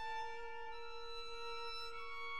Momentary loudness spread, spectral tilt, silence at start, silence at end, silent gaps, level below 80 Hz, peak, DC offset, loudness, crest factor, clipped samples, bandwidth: 4 LU; -1.5 dB/octave; 0 s; 0 s; none; -64 dBFS; -34 dBFS; 0.4%; -47 LUFS; 12 dB; under 0.1%; 16 kHz